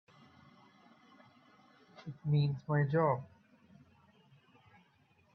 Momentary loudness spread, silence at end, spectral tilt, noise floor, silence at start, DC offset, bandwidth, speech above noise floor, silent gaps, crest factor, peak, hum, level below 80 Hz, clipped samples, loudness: 20 LU; 2.1 s; -10 dB/octave; -70 dBFS; 2 s; under 0.1%; 5.6 kHz; 37 dB; none; 20 dB; -18 dBFS; none; -76 dBFS; under 0.1%; -33 LUFS